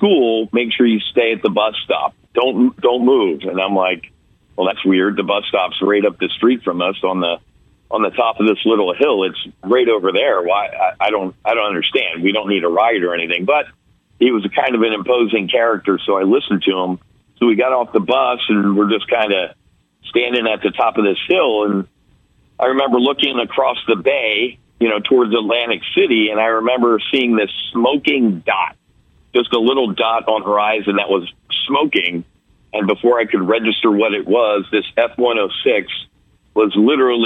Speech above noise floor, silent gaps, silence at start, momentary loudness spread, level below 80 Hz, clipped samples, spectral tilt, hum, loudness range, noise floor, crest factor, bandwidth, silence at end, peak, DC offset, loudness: 39 dB; none; 0 s; 5 LU; -58 dBFS; under 0.1%; -7 dB/octave; none; 2 LU; -55 dBFS; 14 dB; 4.1 kHz; 0 s; -2 dBFS; under 0.1%; -16 LUFS